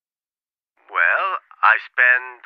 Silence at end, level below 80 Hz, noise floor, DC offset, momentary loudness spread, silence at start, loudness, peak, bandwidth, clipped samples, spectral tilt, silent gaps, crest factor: 0.1 s; -88 dBFS; under -90 dBFS; under 0.1%; 8 LU; 0.9 s; -17 LUFS; 0 dBFS; 5.6 kHz; under 0.1%; -1 dB/octave; none; 20 dB